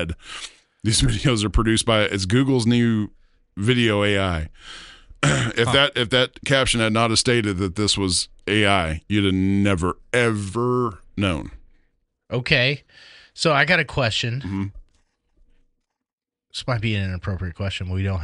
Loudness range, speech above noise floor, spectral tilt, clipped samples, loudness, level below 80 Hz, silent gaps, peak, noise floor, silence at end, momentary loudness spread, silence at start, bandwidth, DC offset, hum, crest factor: 6 LU; 66 dB; -4.5 dB/octave; under 0.1%; -21 LUFS; -38 dBFS; 16.13-16.18 s; -2 dBFS; -87 dBFS; 0 s; 12 LU; 0 s; 11.5 kHz; under 0.1%; none; 20 dB